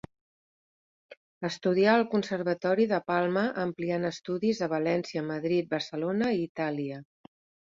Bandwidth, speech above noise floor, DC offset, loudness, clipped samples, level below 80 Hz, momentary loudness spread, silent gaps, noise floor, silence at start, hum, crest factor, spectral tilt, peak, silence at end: 7.6 kHz; over 62 dB; under 0.1%; -29 LUFS; under 0.1%; -70 dBFS; 8 LU; 1.17-1.41 s, 6.49-6.55 s; under -90 dBFS; 1.1 s; none; 20 dB; -6.5 dB/octave; -10 dBFS; 0.7 s